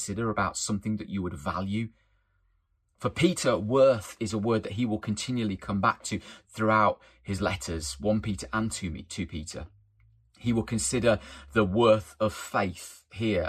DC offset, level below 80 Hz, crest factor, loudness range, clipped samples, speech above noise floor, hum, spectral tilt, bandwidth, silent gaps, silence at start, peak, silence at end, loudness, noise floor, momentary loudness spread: under 0.1%; -52 dBFS; 20 dB; 5 LU; under 0.1%; 43 dB; none; -5 dB/octave; 14.5 kHz; none; 0 s; -8 dBFS; 0 s; -28 LUFS; -71 dBFS; 13 LU